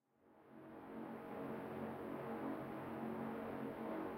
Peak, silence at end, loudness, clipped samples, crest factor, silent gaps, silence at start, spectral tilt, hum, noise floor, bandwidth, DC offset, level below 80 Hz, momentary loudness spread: -34 dBFS; 0 s; -48 LUFS; under 0.1%; 14 dB; none; 0.25 s; -8 dB/octave; none; -69 dBFS; 16 kHz; under 0.1%; -78 dBFS; 9 LU